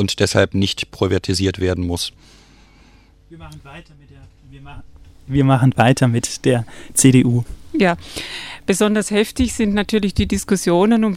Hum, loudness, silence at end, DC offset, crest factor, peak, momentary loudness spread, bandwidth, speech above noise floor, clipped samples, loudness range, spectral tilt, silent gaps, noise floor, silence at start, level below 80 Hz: none; -17 LUFS; 0 s; under 0.1%; 18 dB; 0 dBFS; 12 LU; 16 kHz; 31 dB; under 0.1%; 10 LU; -5 dB/octave; none; -49 dBFS; 0 s; -38 dBFS